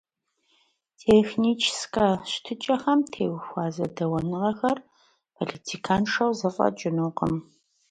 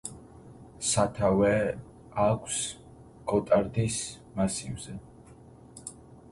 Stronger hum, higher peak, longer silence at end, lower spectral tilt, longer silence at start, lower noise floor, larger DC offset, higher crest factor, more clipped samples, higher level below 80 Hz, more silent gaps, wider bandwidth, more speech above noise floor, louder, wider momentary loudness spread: neither; about the same, -8 dBFS vs -10 dBFS; about the same, 0.5 s vs 0.4 s; about the same, -5 dB/octave vs -4.5 dB/octave; first, 1.05 s vs 0.05 s; first, -72 dBFS vs -51 dBFS; neither; about the same, 18 dB vs 20 dB; neither; about the same, -56 dBFS vs -52 dBFS; neither; about the same, 10.5 kHz vs 11.5 kHz; first, 47 dB vs 24 dB; about the same, -26 LUFS vs -28 LUFS; second, 11 LU vs 19 LU